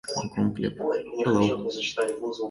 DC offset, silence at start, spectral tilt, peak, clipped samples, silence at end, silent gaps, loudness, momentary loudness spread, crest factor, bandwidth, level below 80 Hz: under 0.1%; 0.05 s; -5 dB/octave; -10 dBFS; under 0.1%; 0 s; none; -27 LUFS; 6 LU; 16 dB; 11.5 kHz; -58 dBFS